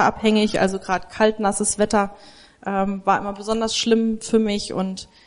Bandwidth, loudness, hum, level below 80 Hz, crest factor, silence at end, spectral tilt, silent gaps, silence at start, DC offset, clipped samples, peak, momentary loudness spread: 11 kHz; -21 LUFS; none; -48 dBFS; 16 dB; 0.2 s; -4 dB/octave; none; 0 s; under 0.1%; under 0.1%; -4 dBFS; 8 LU